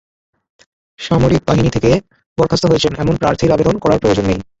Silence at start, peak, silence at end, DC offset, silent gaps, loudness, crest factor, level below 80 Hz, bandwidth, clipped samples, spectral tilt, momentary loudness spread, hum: 1 s; 0 dBFS; 0.2 s; under 0.1%; 2.26-2.36 s; -14 LUFS; 14 dB; -34 dBFS; 8.2 kHz; under 0.1%; -6.5 dB/octave; 5 LU; none